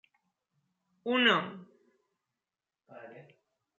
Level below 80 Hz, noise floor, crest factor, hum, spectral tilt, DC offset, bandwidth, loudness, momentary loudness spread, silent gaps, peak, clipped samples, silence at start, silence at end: -88 dBFS; under -90 dBFS; 24 dB; none; -1 dB/octave; under 0.1%; 7.4 kHz; -27 LUFS; 26 LU; none; -12 dBFS; under 0.1%; 1.05 s; 0.6 s